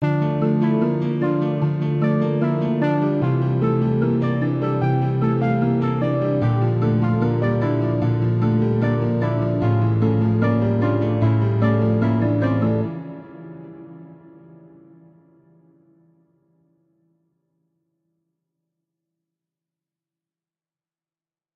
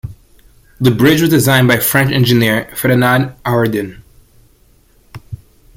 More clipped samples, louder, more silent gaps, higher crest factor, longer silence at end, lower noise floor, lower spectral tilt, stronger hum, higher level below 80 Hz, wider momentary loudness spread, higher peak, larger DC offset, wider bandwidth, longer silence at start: neither; second, -20 LUFS vs -12 LUFS; neither; about the same, 16 dB vs 14 dB; first, 7.4 s vs 0.4 s; first, under -90 dBFS vs -50 dBFS; first, -10.5 dB/octave vs -5 dB/octave; neither; second, -52 dBFS vs -42 dBFS; second, 3 LU vs 22 LU; second, -6 dBFS vs 0 dBFS; neither; second, 5 kHz vs 16.5 kHz; about the same, 0 s vs 0.05 s